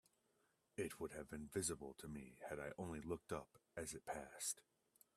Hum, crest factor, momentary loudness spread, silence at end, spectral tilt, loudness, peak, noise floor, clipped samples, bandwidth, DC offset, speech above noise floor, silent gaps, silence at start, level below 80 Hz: none; 20 dB; 10 LU; 0.55 s; -3.5 dB/octave; -49 LUFS; -30 dBFS; -83 dBFS; under 0.1%; 15 kHz; under 0.1%; 33 dB; none; 0.8 s; -72 dBFS